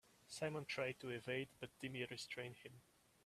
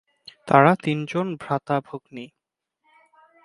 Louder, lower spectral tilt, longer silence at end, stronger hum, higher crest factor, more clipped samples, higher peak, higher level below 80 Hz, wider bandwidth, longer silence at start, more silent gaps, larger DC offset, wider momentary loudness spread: second, -47 LUFS vs -21 LUFS; second, -4.5 dB/octave vs -7.5 dB/octave; second, 0.45 s vs 1.2 s; neither; about the same, 20 dB vs 24 dB; neither; second, -30 dBFS vs 0 dBFS; second, -82 dBFS vs -66 dBFS; first, 15 kHz vs 11.5 kHz; second, 0.05 s vs 0.45 s; neither; neither; second, 12 LU vs 24 LU